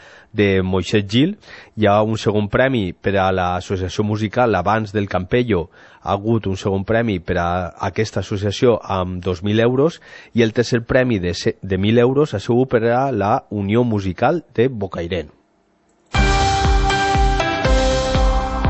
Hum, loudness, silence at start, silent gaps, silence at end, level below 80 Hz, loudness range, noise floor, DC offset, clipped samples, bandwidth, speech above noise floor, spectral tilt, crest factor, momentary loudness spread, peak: none; -18 LUFS; 0.35 s; none; 0 s; -28 dBFS; 3 LU; -60 dBFS; under 0.1%; under 0.1%; 8.4 kHz; 42 dB; -6 dB/octave; 16 dB; 7 LU; -2 dBFS